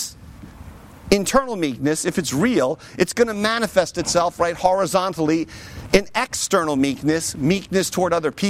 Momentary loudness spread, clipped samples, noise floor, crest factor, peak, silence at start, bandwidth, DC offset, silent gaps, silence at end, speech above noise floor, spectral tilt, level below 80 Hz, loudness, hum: 5 LU; under 0.1%; -40 dBFS; 18 dB; -2 dBFS; 0 s; 16.5 kHz; under 0.1%; none; 0 s; 20 dB; -4 dB/octave; -44 dBFS; -20 LUFS; none